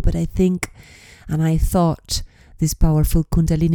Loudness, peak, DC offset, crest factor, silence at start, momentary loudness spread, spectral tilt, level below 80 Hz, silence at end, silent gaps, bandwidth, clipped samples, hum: -20 LUFS; -4 dBFS; under 0.1%; 14 dB; 0 s; 8 LU; -6.5 dB/octave; -24 dBFS; 0 s; none; 18 kHz; under 0.1%; none